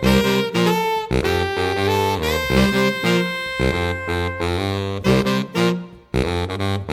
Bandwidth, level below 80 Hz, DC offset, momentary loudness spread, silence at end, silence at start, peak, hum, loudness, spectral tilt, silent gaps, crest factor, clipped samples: 17 kHz; -34 dBFS; under 0.1%; 6 LU; 0 s; 0 s; -2 dBFS; none; -20 LUFS; -5.5 dB/octave; none; 16 dB; under 0.1%